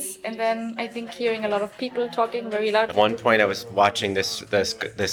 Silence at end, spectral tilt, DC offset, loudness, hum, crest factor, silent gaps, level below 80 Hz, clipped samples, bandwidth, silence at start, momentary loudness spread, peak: 0 s; -3.5 dB/octave; under 0.1%; -23 LUFS; none; 20 dB; none; -64 dBFS; under 0.1%; 19.5 kHz; 0 s; 9 LU; -4 dBFS